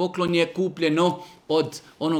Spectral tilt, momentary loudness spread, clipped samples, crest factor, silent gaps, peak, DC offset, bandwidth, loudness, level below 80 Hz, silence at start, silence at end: -5.5 dB/octave; 9 LU; under 0.1%; 16 dB; none; -8 dBFS; under 0.1%; 15 kHz; -24 LUFS; -64 dBFS; 0 s; 0 s